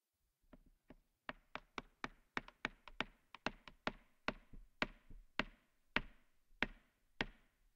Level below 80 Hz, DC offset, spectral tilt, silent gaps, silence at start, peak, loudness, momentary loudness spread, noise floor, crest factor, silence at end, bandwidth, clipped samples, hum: -62 dBFS; under 0.1%; -4 dB/octave; none; 0.55 s; -16 dBFS; -47 LUFS; 11 LU; -81 dBFS; 34 dB; 0.4 s; 15.5 kHz; under 0.1%; none